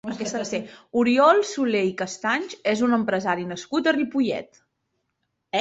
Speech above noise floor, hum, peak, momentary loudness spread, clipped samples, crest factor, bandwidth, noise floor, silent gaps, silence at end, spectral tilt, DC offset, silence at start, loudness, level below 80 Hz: 54 dB; none; -4 dBFS; 11 LU; under 0.1%; 20 dB; 8 kHz; -77 dBFS; none; 0 s; -4.5 dB/octave; under 0.1%; 0.05 s; -23 LUFS; -66 dBFS